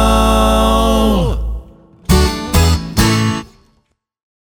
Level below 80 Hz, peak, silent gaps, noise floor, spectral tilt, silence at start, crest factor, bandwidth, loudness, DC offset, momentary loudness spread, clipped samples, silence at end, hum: -18 dBFS; 0 dBFS; none; -62 dBFS; -5 dB/octave; 0 s; 14 dB; over 20 kHz; -14 LUFS; under 0.1%; 12 LU; under 0.1%; 1.1 s; none